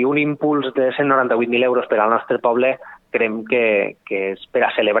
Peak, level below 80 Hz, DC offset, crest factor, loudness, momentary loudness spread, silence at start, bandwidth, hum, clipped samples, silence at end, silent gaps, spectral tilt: -2 dBFS; -66 dBFS; under 0.1%; 16 dB; -18 LUFS; 7 LU; 0 s; 4.1 kHz; none; under 0.1%; 0 s; none; -8.5 dB/octave